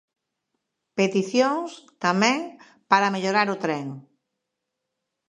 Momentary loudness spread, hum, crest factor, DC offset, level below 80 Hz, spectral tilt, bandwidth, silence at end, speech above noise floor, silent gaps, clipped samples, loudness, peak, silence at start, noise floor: 16 LU; none; 24 dB; under 0.1%; -78 dBFS; -4.5 dB/octave; 10.5 kHz; 1.25 s; 59 dB; none; under 0.1%; -23 LUFS; -2 dBFS; 0.95 s; -82 dBFS